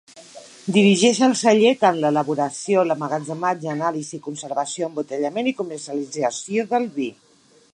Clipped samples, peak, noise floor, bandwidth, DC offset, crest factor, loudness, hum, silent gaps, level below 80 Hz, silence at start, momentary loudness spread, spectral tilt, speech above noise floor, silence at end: under 0.1%; -2 dBFS; -43 dBFS; 11 kHz; under 0.1%; 18 dB; -21 LUFS; none; none; -74 dBFS; 0.15 s; 13 LU; -4.5 dB/octave; 23 dB; 0.6 s